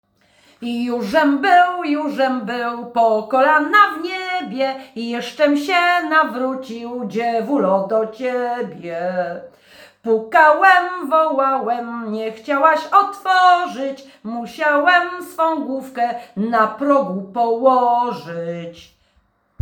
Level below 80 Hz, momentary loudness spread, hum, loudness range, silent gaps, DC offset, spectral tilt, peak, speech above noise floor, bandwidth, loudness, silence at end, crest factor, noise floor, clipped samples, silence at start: -68 dBFS; 14 LU; none; 4 LU; none; under 0.1%; -5 dB/octave; 0 dBFS; 44 dB; 19.5 kHz; -17 LUFS; 0.8 s; 18 dB; -61 dBFS; under 0.1%; 0.6 s